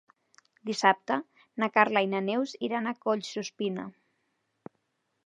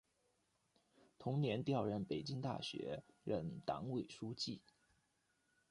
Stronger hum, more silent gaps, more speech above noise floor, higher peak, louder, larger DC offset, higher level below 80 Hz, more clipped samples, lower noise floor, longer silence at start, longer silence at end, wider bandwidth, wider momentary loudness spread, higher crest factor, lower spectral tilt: neither; neither; first, 49 dB vs 39 dB; first, -6 dBFS vs -26 dBFS; first, -29 LUFS vs -43 LUFS; neither; second, -84 dBFS vs -74 dBFS; neither; second, -78 dBFS vs -82 dBFS; second, 0.65 s vs 1.2 s; first, 1.35 s vs 1.1 s; about the same, 10.5 kHz vs 11 kHz; first, 13 LU vs 9 LU; first, 24 dB vs 18 dB; second, -4.5 dB/octave vs -6.5 dB/octave